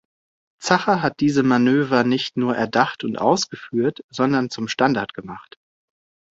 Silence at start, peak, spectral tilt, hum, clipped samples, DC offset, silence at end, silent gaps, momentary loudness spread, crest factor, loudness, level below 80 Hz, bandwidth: 0.6 s; -2 dBFS; -5 dB/octave; none; under 0.1%; under 0.1%; 0.9 s; 4.04-4.09 s; 8 LU; 20 dB; -20 LUFS; -60 dBFS; 7.8 kHz